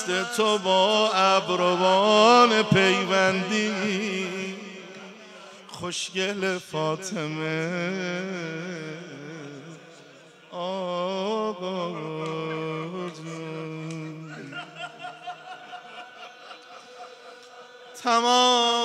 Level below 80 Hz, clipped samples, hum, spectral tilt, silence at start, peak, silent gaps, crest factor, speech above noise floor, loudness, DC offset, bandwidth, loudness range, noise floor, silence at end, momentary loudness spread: -72 dBFS; under 0.1%; none; -4 dB/octave; 0 s; -4 dBFS; none; 22 dB; 27 dB; -24 LUFS; under 0.1%; 14 kHz; 18 LU; -50 dBFS; 0 s; 24 LU